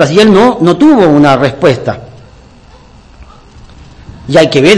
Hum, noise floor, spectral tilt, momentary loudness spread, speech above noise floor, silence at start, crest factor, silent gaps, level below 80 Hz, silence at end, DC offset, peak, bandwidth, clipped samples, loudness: none; -37 dBFS; -6 dB/octave; 12 LU; 31 dB; 0 s; 8 dB; none; -38 dBFS; 0 s; under 0.1%; 0 dBFS; 11 kHz; 7%; -7 LUFS